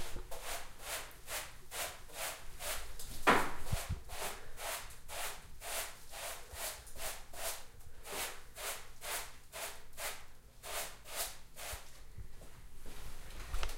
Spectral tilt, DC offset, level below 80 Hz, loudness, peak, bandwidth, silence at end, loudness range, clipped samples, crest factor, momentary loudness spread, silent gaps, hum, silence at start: -2 dB/octave; under 0.1%; -48 dBFS; -41 LUFS; -14 dBFS; 16 kHz; 0 s; 7 LU; under 0.1%; 26 dB; 11 LU; none; none; 0 s